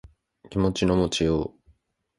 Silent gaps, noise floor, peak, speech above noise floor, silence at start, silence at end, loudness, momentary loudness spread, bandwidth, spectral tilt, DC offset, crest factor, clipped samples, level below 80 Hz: none; -63 dBFS; -10 dBFS; 40 dB; 0.5 s; 0.7 s; -24 LUFS; 9 LU; 11.5 kHz; -5.5 dB/octave; under 0.1%; 18 dB; under 0.1%; -42 dBFS